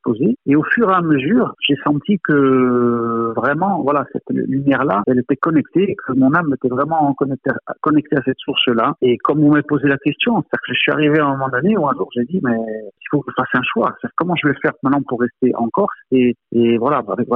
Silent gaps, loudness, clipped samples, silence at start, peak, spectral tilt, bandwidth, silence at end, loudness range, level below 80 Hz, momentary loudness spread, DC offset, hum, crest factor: none; -17 LUFS; under 0.1%; 0.05 s; -4 dBFS; -9.5 dB/octave; 3.9 kHz; 0 s; 3 LU; -58 dBFS; 6 LU; under 0.1%; none; 14 dB